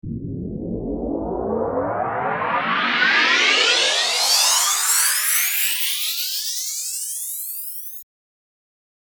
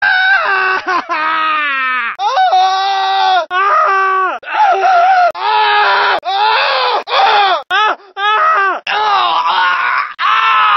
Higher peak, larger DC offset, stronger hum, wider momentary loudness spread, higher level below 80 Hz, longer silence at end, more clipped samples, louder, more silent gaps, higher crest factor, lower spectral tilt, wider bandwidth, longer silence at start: second, -4 dBFS vs 0 dBFS; neither; neither; first, 14 LU vs 5 LU; first, -46 dBFS vs -64 dBFS; first, 1 s vs 0 s; neither; second, -18 LUFS vs -11 LUFS; neither; first, 18 dB vs 12 dB; about the same, -1 dB/octave vs -1 dB/octave; first, over 20 kHz vs 6.4 kHz; about the same, 0.05 s vs 0 s